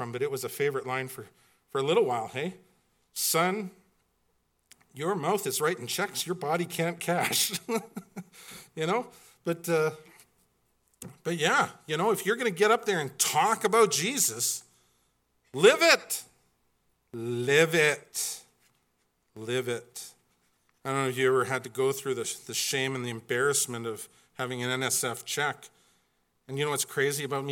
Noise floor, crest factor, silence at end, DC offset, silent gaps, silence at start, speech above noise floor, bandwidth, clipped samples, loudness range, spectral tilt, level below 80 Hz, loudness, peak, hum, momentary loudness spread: -74 dBFS; 26 dB; 0 s; under 0.1%; none; 0 s; 45 dB; 17.5 kHz; under 0.1%; 7 LU; -3 dB/octave; -78 dBFS; -28 LUFS; -4 dBFS; none; 18 LU